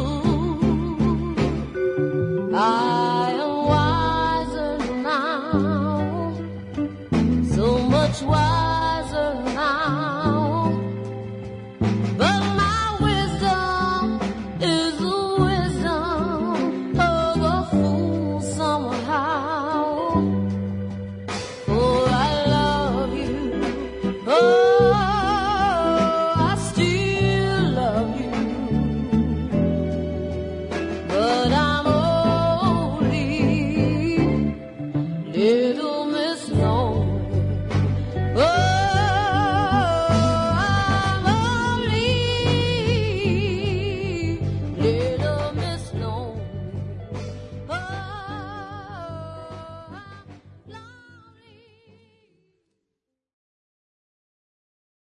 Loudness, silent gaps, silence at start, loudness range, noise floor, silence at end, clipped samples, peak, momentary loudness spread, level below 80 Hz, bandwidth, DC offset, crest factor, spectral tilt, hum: -22 LUFS; none; 0 s; 7 LU; -82 dBFS; 4.25 s; under 0.1%; -6 dBFS; 11 LU; -38 dBFS; 11 kHz; under 0.1%; 16 dB; -6.5 dB/octave; none